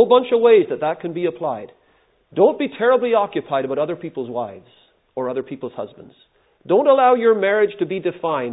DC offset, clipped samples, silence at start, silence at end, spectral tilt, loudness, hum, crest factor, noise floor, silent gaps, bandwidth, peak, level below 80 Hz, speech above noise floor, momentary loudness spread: under 0.1%; under 0.1%; 0 s; 0 s; -10.5 dB/octave; -18 LUFS; none; 18 dB; -59 dBFS; none; 4 kHz; -2 dBFS; -70 dBFS; 41 dB; 16 LU